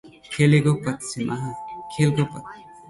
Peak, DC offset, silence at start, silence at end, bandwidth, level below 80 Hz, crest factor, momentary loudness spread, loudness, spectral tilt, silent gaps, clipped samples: -6 dBFS; under 0.1%; 0.05 s; 0 s; 11.5 kHz; -56 dBFS; 18 dB; 17 LU; -22 LUFS; -6.5 dB/octave; none; under 0.1%